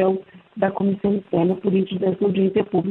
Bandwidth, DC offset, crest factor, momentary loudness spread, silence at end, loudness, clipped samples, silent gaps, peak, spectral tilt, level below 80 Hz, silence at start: 4.1 kHz; under 0.1%; 16 dB; 4 LU; 0 s; -21 LUFS; under 0.1%; none; -4 dBFS; -11 dB/octave; -58 dBFS; 0 s